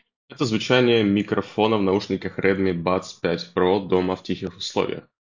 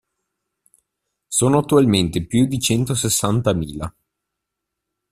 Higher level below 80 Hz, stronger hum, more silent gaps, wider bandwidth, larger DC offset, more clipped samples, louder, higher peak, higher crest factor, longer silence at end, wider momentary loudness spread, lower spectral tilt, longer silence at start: about the same, -50 dBFS vs -46 dBFS; neither; neither; second, 7.6 kHz vs 15.5 kHz; neither; neither; second, -22 LUFS vs -18 LUFS; about the same, -4 dBFS vs -2 dBFS; about the same, 20 dB vs 18 dB; second, 0.25 s vs 1.2 s; about the same, 9 LU vs 10 LU; about the same, -6 dB/octave vs -5 dB/octave; second, 0.3 s vs 1.3 s